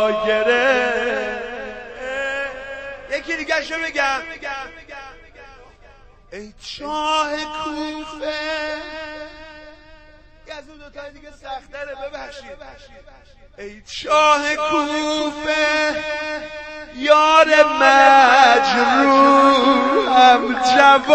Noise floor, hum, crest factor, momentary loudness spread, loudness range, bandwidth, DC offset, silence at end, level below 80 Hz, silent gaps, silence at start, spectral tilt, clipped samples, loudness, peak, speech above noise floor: -46 dBFS; none; 18 dB; 23 LU; 23 LU; 8.8 kHz; under 0.1%; 0 s; -48 dBFS; none; 0 s; -2.5 dB/octave; under 0.1%; -16 LUFS; 0 dBFS; 30 dB